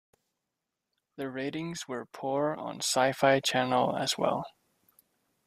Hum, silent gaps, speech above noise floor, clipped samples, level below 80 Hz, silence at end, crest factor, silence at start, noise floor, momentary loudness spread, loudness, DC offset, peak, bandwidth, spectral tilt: none; none; 57 dB; under 0.1%; -72 dBFS; 0.95 s; 22 dB; 1.2 s; -86 dBFS; 13 LU; -29 LUFS; under 0.1%; -8 dBFS; 15.5 kHz; -3.5 dB/octave